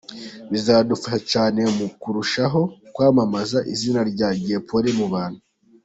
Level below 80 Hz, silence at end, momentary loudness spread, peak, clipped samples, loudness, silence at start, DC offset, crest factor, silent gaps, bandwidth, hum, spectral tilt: -56 dBFS; 0.45 s; 9 LU; -4 dBFS; under 0.1%; -21 LUFS; 0.1 s; under 0.1%; 18 dB; none; 8.2 kHz; none; -5.5 dB/octave